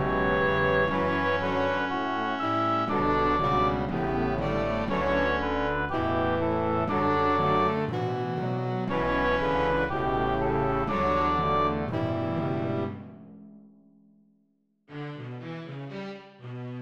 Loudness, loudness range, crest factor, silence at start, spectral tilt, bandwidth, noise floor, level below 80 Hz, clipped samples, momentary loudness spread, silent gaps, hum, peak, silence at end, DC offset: -26 LUFS; 11 LU; 14 dB; 0 s; -7.5 dB/octave; over 20 kHz; -70 dBFS; -44 dBFS; under 0.1%; 14 LU; none; none; -12 dBFS; 0 s; 0.6%